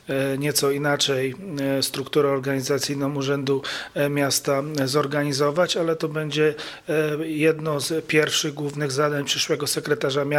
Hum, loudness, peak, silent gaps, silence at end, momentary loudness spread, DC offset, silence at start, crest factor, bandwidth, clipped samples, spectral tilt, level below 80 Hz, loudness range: none; -23 LUFS; -4 dBFS; none; 0 s; 5 LU; under 0.1%; 0.05 s; 18 dB; 16.5 kHz; under 0.1%; -4 dB/octave; -62 dBFS; 1 LU